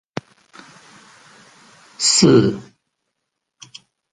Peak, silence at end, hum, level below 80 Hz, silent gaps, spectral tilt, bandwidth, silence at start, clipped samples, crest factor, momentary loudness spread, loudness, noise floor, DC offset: 0 dBFS; 1.5 s; none; -56 dBFS; none; -4 dB/octave; 11 kHz; 2 s; under 0.1%; 22 dB; 22 LU; -14 LUFS; -78 dBFS; under 0.1%